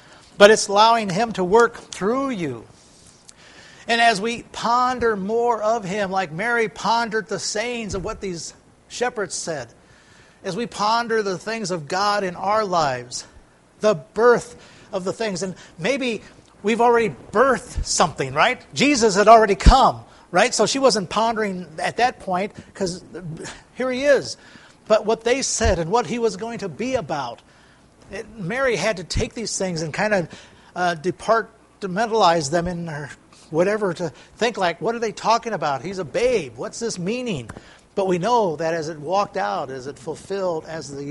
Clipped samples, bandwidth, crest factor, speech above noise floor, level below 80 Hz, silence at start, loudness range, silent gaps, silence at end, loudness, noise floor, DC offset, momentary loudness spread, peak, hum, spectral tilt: under 0.1%; 11.5 kHz; 22 dB; 31 dB; -36 dBFS; 0.4 s; 8 LU; none; 0 s; -21 LUFS; -52 dBFS; under 0.1%; 15 LU; 0 dBFS; none; -4 dB/octave